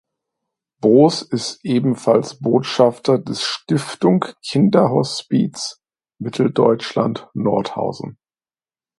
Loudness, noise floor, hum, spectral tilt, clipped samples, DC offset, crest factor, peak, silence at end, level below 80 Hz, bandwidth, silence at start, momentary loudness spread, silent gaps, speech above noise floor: -18 LUFS; under -90 dBFS; none; -6 dB/octave; under 0.1%; under 0.1%; 18 dB; 0 dBFS; 0.85 s; -62 dBFS; 11.5 kHz; 0.85 s; 10 LU; none; over 73 dB